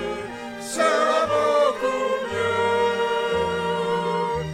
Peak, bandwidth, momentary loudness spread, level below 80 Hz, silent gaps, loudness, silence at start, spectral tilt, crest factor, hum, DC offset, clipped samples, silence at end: -8 dBFS; 16 kHz; 10 LU; -52 dBFS; none; -22 LUFS; 0 s; -4 dB/octave; 16 dB; none; under 0.1%; under 0.1%; 0 s